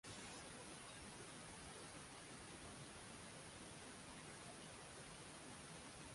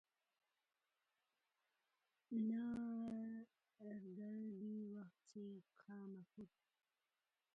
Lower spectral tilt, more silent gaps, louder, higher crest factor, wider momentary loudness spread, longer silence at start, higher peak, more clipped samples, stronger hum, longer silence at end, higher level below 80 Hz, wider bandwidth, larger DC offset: second, -3 dB/octave vs -8.5 dB/octave; neither; second, -55 LUFS vs -50 LUFS; about the same, 14 dB vs 16 dB; second, 1 LU vs 17 LU; second, 0.05 s vs 2.3 s; second, -44 dBFS vs -36 dBFS; neither; neither; second, 0 s vs 1.1 s; first, -72 dBFS vs -88 dBFS; first, 11.5 kHz vs 4.9 kHz; neither